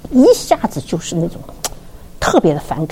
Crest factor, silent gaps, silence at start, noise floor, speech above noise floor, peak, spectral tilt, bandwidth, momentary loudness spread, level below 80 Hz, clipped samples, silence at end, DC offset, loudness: 16 dB; none; 0.05 s; -33 dBFS; 19 dB; 0 dBFS; -5.5 dB/octave; 17 kHz; 15 LU; -36 dBFS; under 0.1%; 0 s; under 0.1%; -16 LUFS